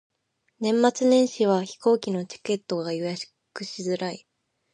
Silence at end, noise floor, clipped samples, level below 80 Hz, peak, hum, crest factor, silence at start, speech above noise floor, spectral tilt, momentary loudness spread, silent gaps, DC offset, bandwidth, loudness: 0.55 s; -73 dBFS; under 0.1%; -76 dBFS; -6 dBFS; none; 20 dB; 0.6 s; 49 dB; -5 dB/octave; 15 LU; none; under 0.1%; 11 kHz; -25 LUFS